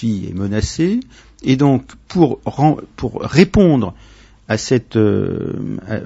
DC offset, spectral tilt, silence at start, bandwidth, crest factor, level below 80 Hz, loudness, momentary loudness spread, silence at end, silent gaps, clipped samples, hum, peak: under 0.1%; -7 dB/octave; 0 s; 8 kHz; 16 dB; -36 dBFS; -17 LUFS; 11 LU; 0 s; none; under 0.1%; none; 0 dBFS